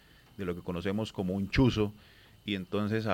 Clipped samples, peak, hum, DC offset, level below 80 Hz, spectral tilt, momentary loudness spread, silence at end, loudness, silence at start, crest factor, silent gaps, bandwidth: under 0.1%; -14 dBFS; none; under 0.1%; -48 dBFS; -7 dB/octave; 11 LU; 0 s; -32 LUFS; 0.4 s; 18 dB; none; 16.5 kHz